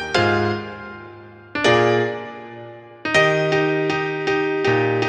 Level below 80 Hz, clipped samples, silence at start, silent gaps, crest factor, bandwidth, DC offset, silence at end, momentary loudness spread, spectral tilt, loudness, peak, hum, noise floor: -54 dBFS; under 0.1%; 0 s; none; 18 dB; 10 kHz; under 0.1%; 0 s; 20 LU; -5.5 dB/octave; -19 LUFS; -4 dBFS; none; -41 dBFS